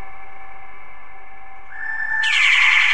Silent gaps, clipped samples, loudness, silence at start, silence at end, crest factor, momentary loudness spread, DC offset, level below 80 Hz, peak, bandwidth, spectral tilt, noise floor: none; under 0.1%; -15 LUFS; 0 s; 0 s; 18 dB; 18 LU; 5%; -56 dBFS; -2 dBFS; 11.5 kHz; 1.5 dB/octave; -42 dBFS